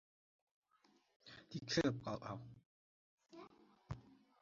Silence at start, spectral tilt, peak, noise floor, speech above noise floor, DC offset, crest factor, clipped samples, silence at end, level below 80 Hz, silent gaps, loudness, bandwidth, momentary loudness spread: 1.25 s; -4.5 dB/octave; -22 dBFS; -76 dBFS; 34 dB; under 0.1%; 26 dB; under 0.1%; 0.3 s; -72 dBFS; 2.66-3.18 s; -44 LUFS; 7.2 kHz; 24 LU